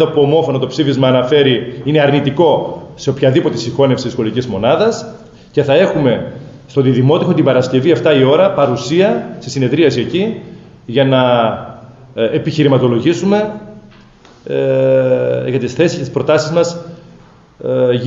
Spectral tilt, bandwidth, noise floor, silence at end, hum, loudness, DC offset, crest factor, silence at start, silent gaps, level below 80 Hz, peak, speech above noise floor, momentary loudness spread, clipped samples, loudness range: -6.5 dB/octave; 8 kHz; -42 dBFS; 0 s; none; -13 LUFS; under 0.1%; 12 dB; 0 s; none; -50 dBFS; 0 dBFS; 30 dB; 10 LU; under 0.1%; 3 LU